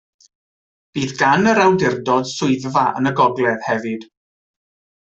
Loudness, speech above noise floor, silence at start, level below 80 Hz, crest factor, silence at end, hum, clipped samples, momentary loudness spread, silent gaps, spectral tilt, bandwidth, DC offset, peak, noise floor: -17 LUFS; over 73 dB; 0.95 s; -56 dBFS; 16 dB; 1 s; none; under 0.1%; 11 LU; none; -5.5 dB/octave; 8.2 kHz; under 0.1%; -2 dBFS; under -90 dBFS